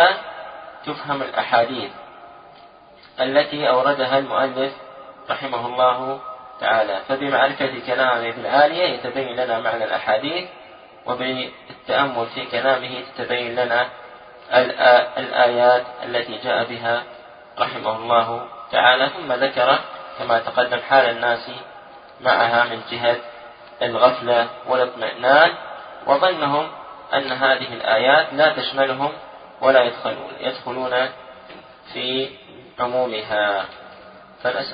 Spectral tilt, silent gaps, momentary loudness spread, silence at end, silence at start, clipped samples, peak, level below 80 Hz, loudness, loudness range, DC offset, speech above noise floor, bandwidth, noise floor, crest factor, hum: -8.5 dB/octave; none; 17 LU; 0 s; 0 s; under 0.1%; 0 dBFS; -64 dBFS; -20 LUFS; 5 LU; under 0.1%; 27 dB; 5.2 kHz; -47 dBFS; 20 dB; none